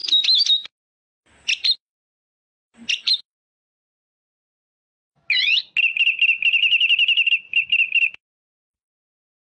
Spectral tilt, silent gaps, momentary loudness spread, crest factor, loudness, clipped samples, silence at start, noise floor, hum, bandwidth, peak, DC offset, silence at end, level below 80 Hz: 4 dB/octave; 0.72-1.21 s, 1.80-2.72 s, 3.25-5.10 s; 8 LU; 14 dB; -17 LUFS; under 0.1%; 0.05 s; under -90 dBFS; none; 9 kHz; -10 dBFS; under 0.1%; 1.4 s; -78 dBFS